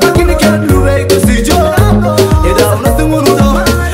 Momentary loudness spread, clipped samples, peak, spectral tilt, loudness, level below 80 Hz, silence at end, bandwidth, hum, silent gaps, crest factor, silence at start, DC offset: 1 LU; 0.2%; 0 dBFS; -5.5 dB/octave; -9 LUFS; -16 dBFS; 0 s; 16.5 kHz; none; none; 8 dB; 0 s; under 0.1%